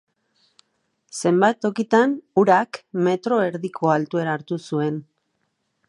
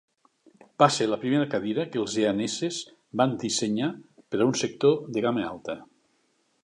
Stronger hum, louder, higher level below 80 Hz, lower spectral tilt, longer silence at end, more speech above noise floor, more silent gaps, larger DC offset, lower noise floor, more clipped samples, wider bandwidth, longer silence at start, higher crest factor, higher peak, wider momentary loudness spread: neither; first, -21 LUFS vs -26 LUFS; second, -74 dBFS vs -68 dBFS; first, -6 dB/octave vs -4.5 dB/octave; about the same, 0.85 s vs 0.8 s; first, 52 dB vs 44 dB; neither; neither; about the same, -73 dBFS vs -70 dBFS; neither; about the same, 11.5 kHz vs 11 kHz; first, 1.15 s vs 0.8 s; about the same, 20 dB vs 22 dB; first, -2 dBFS vs -6 dBFS; second, 9 LU vs 13 LU